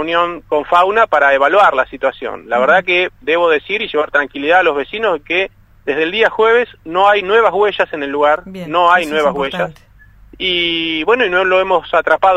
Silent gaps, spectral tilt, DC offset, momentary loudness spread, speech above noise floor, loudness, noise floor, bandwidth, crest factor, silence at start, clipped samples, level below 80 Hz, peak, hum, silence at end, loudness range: none; -4.5 dB/octave; under 0.1%; 8 LU; 28 dB; -14 LUFS; -42 dBFS; 12.5 kHz; 14 dB; 0 s; under 0.1%; -46 dBFS; 0 dBFS; none; 0 s; 3 LU